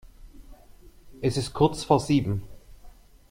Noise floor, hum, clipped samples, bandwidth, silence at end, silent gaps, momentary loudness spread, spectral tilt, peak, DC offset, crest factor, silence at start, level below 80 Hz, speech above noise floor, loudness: -50 dBFS; none; under 0.1%; 16 kHz; 0.4 s; none; 9 LU; -6.5 dB/octave; -6 dBFS; under 0.1%; 22 dB; 0.05 s; -48 dBFS; 27 dB; -25 LUFS